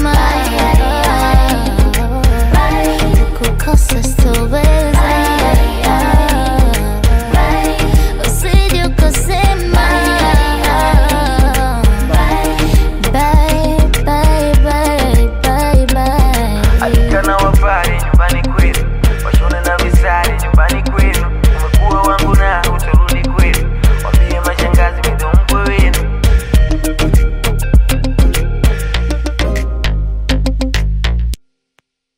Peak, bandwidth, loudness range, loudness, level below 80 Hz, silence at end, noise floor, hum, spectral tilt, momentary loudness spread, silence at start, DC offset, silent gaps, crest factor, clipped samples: 0 dBFS; 16.5 kHz; 2 LU; -13 LUFS; -12 dBFS; 0.8 s; -60 dBFS; none; -5.5 dB/octave; 4 LU; 0 s; under 0.1%; none; 10 dB; under 0.1%